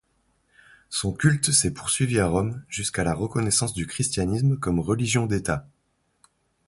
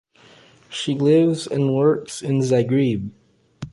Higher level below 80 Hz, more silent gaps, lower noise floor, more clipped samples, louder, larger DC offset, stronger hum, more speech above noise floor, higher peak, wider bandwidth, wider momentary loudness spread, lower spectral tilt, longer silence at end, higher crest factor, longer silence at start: first, -44 dBFS vs -56 dBFS; neither; first, -70 dBFS vs -50 dBFS; neither; second, -24 LUFS vs -20 LUFS; neither; neither; first, 47 dB vs 32 dB; about the same, -6 dBFS vs -6 dBFS; about the same, 11.5 kHz vs 11.5 kHz; second, 8 LU vs 13 LU; second, -4 dB/octave vs -6.5 dB/octave; first, 1.05 s vs 0.05 s; about the same, 18 dB vs 14 dB; first, 0.9 s vs 0.7 s